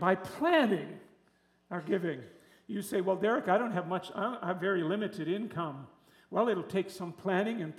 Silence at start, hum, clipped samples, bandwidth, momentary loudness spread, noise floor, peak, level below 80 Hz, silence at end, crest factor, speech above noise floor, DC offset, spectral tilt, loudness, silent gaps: 0 s; none; under 0.1%; 15 kHz; 12 LU; -69 dBFS; -12 dBFS; -78 dBFS; 0 s; 20 dB; 37 dB; under 0.1%; -6 dB/octave; -32 LUFS; none